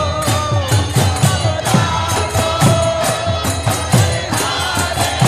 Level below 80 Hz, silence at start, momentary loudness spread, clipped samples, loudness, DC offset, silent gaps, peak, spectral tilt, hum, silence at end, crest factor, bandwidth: -32 dBFS; 0 s; 4 LU; under 0.1%; -15 LUFS; 0.2%; none; 0 dBFS; -4.5 dB/octave; none; 0 s; 14 dB; 15 kHz